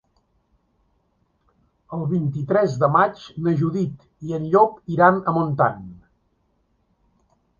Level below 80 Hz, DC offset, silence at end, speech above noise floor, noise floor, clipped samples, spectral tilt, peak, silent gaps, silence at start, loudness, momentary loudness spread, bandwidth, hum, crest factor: -56 dBFS; under 0.1%; 1.65 s; 47 dB; -67 dBFS; under 0.1%; -8.5 dB/octave; -2 dBFS; none; 1.9 s; -20 LUFS; 13 LU; 7.2 kHz; none; 22 dB